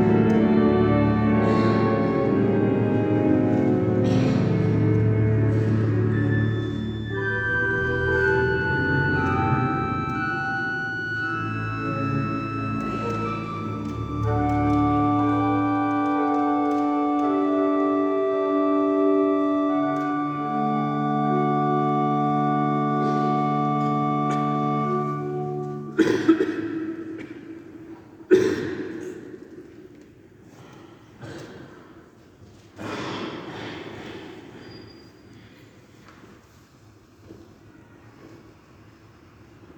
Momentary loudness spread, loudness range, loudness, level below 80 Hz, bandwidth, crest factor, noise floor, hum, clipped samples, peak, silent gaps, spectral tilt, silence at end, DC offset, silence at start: 16 LU; 15 LU; -23 LUFS; -46 dBFS; 8.4 kHz; 18 dB; -52 dBFS; none; under 0.1%; -4 dBFS; none; -8 dB/octave; 0.05 s; under 0.1%; 0 s